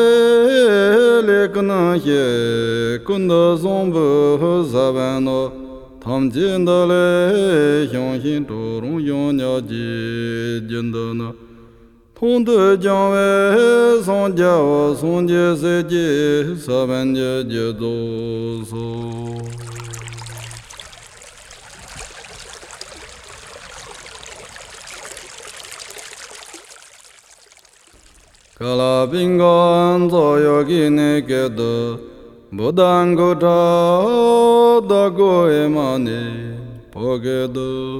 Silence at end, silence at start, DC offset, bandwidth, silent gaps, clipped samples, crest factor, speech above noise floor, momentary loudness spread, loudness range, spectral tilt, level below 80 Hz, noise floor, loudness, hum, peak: 0 s; 0 s; under 0.1%; 16 kHz; none; under 0.1%; 16 dB; 34 dB; 22 LU; 20 LU; -6 dB/octave; -50 dBFS; -49 dBFS; -16 LUFS; none; -2 dBFS